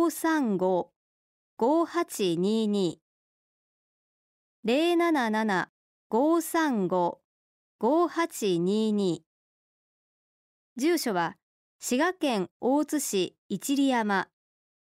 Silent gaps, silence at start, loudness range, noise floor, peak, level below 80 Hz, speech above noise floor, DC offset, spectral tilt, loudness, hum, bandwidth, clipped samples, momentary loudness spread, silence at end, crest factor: 0.96-1.57 s, 3.02-4.63 s, 5.69-6.10 s, 7.24-7.79 s, 9.26-10.76 s, 11.43-11.79 s, 12.51-12.60 s, 13.38-13.49 s; 0 s; 3 LU; under -90 dBFS; -14 dBFS; -76 dBFS; over 64 dB; under 0.1%; -4.5 dB/octave; -27 LUFS; none; 16 kHz; under 0.1%; 8 LU; 0.6 s; 14 dB